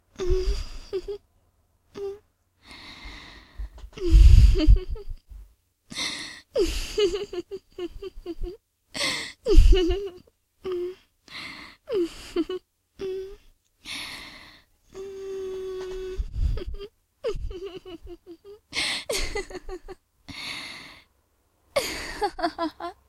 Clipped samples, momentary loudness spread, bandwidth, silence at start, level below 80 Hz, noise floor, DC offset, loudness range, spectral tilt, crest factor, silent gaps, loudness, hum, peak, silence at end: under 0.1%; 21 LU; 13.5 kHz; 0.2 s; -26 dBFS; -68 dBFS; under 0.1%; 12 LU; -5.5 dB/octave; 24 dB; none; -27 LUFS; none; -2 dBFS; 0.15 s